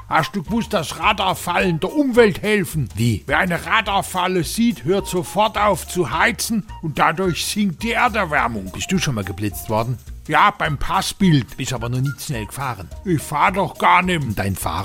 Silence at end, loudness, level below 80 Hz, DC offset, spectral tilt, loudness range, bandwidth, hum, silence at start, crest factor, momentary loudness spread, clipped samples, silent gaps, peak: 0 s; -19 LUFS; -38 dBFS; under 0.1%; -4.5 dB/octave; 2 LU; 17 kHz; none; 0 s; 18 dB; 9 LU; under 0.1%; none; -2 dBFS